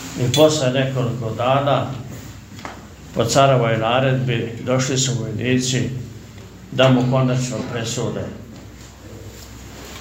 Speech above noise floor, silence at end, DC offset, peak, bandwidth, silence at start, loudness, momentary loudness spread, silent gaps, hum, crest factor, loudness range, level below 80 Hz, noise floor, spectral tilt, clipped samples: 20 dB; 0 s; under 0.1%; 0 dBFS; 16 kHz; 0 s; -19 LUFS; 23 LU; none; none; 20 dB; 3 LU; -46 dBFS; -39 dBFS; -5 dB/octave; under 0.1%